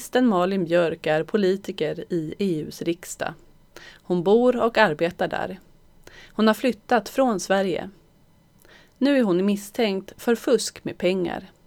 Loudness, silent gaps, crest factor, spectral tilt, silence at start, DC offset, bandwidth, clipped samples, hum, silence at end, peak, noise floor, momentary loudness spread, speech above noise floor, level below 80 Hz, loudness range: -23 LUFS; none; 20 dB; -5 dB/octave; 0 s; under 0.1%; 19 kHz; under 0.1%; none; 0.2 s; -2 dBFS; -57 dBFS; 10 LU; 34 dB; -56 dBFS; 2 LU